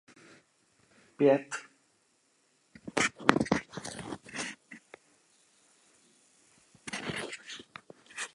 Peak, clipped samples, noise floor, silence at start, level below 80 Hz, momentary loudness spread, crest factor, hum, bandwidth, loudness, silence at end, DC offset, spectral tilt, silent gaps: -2 dBFS; under 0.1%; -71 dBFS; 1.2 s; -66 dBFS; 24 LU; 34 dB; none; 11.5 kHz; -32 LUFS; 0.1 s; under 0.1%; -4 dB/octave; none